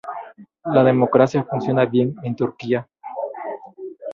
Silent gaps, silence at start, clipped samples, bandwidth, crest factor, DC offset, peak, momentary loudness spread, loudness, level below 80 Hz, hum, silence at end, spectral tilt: none; 0.05 s; under 0.1%; 7.2 kHz; 18 dB; under 0.1%; -2 dBFS; 18 LU; -20 LUFS; -62 dBFS; none; 0 s; -8.5 dB/octave